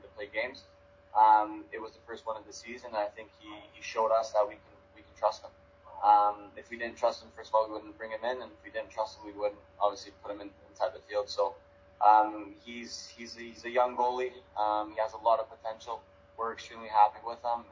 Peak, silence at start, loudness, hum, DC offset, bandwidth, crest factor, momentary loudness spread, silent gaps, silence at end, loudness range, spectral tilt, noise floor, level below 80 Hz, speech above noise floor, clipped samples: -10 dBFS; 0.05 s; -31 LUFS; none; under 0.1%; 7.6 kHz; 22 dB; 19 LU; none; 0.1 s; 5 LU; -3.5 dB/octave; -59 dBFS; -68 dBFS; 27 dB; under 0.1%